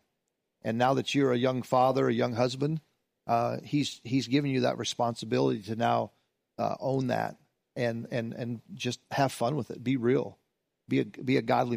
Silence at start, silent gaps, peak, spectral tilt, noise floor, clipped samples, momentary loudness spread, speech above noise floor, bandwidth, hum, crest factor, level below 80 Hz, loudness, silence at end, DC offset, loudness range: 0.65 s; none; -12 dBFS; -6 dB/octave; -82 dBFS; under 0.1%; 9 LU; 53 dB; 15.5 kHz; none; 16 dB; -70 dBFS; -29 LUFS; 0 s; under 0.1%; 4 LU